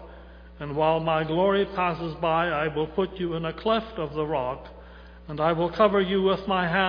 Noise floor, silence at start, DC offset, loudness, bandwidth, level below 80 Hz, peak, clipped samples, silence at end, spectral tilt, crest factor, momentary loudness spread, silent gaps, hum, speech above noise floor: -45 dBFS; 0 s; under 0.1%; -25 LUFS; 5.2 kHz; -48 dBFS; -6 dBFS; under 0.1%; 0 s; -8.5 dB/octave; 20 dB; 10 LU; none; none; 21 dB